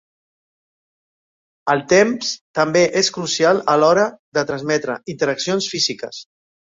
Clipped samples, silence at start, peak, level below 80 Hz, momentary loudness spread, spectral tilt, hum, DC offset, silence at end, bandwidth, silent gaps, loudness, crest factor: under 0.1%; 1.65 s; -2 dBFS; -60 dBFS; 10 LU; -3.5 dB/octave; none; under 0.1%; 0.5 s; 7.8 kHz; 2.41-2.54 s, 4.19-4.32 s; -18 LUFS; 18 dB